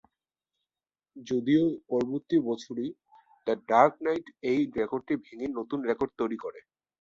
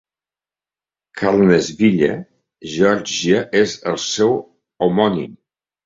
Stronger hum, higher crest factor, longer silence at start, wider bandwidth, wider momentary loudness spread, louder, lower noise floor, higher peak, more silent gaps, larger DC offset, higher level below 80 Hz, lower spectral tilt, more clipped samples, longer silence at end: neither; first, 22 dB vs 16 dB; about the same, 1.15 s vs 1.15 s; about the same, 7.6 kHz vs 7.8 kHz; about the same, 12 LU vs 13 LU; second, -29 LUFS vs -17 LUFS; about the same, under -90 dBFS vs under -90 dBFS; second, -6 dBFS vs -2 dBFS; neither; neither; second, -68 dBFS vs -54 dBFS; first, -7 dB/octave vs -5 dB/octave; neither; about the same, 0.4 s vs 0.5 s